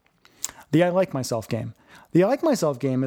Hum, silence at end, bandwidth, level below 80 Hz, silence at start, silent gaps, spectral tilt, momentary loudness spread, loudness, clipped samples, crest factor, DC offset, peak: none; 0 s; over 20 kHz; -64 dBFS; 0.45 s; none; -6 dB/octave; 13 LU; -24 LUFS; under 0.1%; 20 dB; under 0.1%; -4 dBFS